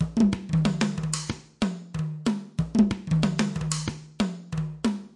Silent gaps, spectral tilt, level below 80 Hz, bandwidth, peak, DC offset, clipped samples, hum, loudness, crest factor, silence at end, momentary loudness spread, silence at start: none; -5.5 dB/octave; -46 dBFS; 11.5 kHz; -8 dBFS; under 0.1%; under 0.1%; none; -27 LUFS; 18 dB; 0.1 s; 9 LU; 0 s